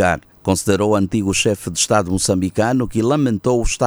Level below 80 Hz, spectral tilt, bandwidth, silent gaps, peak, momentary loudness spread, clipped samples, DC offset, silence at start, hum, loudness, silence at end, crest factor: -34 dBFS; -4.5 dB/octave; over 20 kHz; none; 0 dBFS; 2 LU; under 0.1%; under 0.1%; 0 s; none; -17 LUFS; 0 s; 18 dB